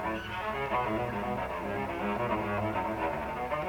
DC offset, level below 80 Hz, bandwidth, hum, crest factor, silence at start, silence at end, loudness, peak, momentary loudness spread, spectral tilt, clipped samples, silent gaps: under 0.1%; -50 dBFS; 19 kHz; none; 14 dB; 0 s; 0 s; -33 LUFS; -18 dBFS; 4 LU; -6.5 dB/octave; under 0.1%; none